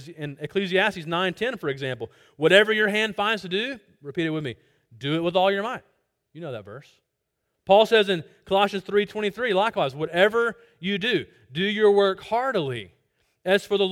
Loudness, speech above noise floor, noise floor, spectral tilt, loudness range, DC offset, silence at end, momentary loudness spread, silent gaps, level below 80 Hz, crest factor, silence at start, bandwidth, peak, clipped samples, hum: -23 LUFS; 55 dB; -79 dBFS; -5 dB/octave; 5 LU; under 0.1%; 0 s; 17 LU; none; -64 dBFS; 20 dB; 0 s; 15.5 kHz; -4 dBFS; under 0.1%; none